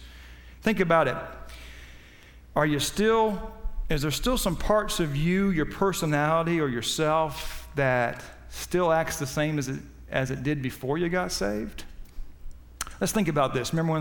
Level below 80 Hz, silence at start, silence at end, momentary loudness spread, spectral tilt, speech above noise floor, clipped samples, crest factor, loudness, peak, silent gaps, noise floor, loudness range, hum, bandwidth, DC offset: -40 dBFS; 0 s; 0 s; 16 LU; -5 dB/octave; 24 dB; under 0.1%; 18 dB; -26 LUFS; -8 dBFS; none; -50 dBFS; 4 LU; none; 19 kHz; under 0.1%